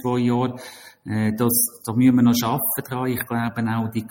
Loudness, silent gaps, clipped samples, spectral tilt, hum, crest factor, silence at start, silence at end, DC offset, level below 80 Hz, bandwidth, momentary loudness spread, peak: -21 LUFS; none; under 0.1%; -5 dB/octave; none; 16 dB; 0 s; 0 s; under 0.1%; -58 dBFS; 17 kHz; 11 LU; -6 dBFS